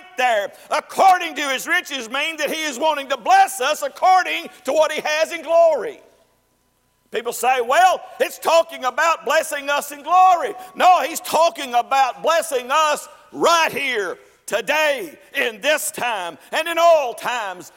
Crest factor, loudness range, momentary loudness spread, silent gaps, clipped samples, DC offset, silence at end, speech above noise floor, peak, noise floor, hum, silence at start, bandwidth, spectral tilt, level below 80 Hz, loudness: 16 dB; 3 LU; 10 LU; none; under 0.1%; under 0.1%; 0.1 s; 45 dB; -4 dBFS; -64 dBFS; none; 0.05 s; 16.5 kHz; -1 dB/octave; -68 dBFS; -19 LUFS